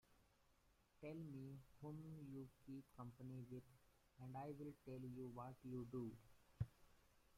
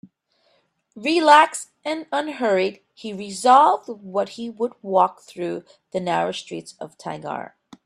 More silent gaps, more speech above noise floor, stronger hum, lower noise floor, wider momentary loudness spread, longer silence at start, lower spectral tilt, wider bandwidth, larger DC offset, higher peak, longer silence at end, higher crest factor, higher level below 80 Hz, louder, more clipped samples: neither; second, 23 dB vs 44 dB; neither; first, -79 dBFS vs -65 dBFS; second, 7 LU vs 20 LU; second, 0.1 s vs 0.95 s; first, -8.5 dB/octave vs -4 dB/octave; first, 16 kHz vs 13 kHz; neither; second, -34 dBFS vs 0 dBFS; second, 0 s vs 0.4 s; about the same, 22 dB vs 22 dB; about the same, -74 dBFS vs -72 dBFS; second, -56 LUFS vs -21 LUFS; neither